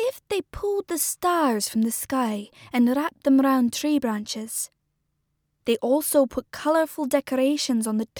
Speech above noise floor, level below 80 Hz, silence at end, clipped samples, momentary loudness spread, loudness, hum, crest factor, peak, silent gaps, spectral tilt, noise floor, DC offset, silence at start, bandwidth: 51 dB; -56 dBFS; 0 s; under 0.1%; 9 LU; -24 LUFS; none; 18 dB; -6 dBFS; none; -3.5 dB/octave; -75 dBFS; under 0.1%; 0 s; over 20 kHz